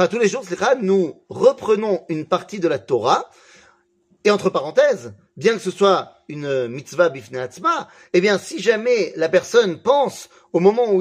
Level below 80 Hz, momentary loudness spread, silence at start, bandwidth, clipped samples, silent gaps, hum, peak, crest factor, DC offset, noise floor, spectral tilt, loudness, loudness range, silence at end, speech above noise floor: -68 dBFS; 8 LU; 0 s; 15 kHz; under 0.1%; none; none; -2 dBFS; 18 dB; under 0.1%; -61 dBFS; -5 dB/octave; -19 LUFS; 2 LU; 0 s; 42 dB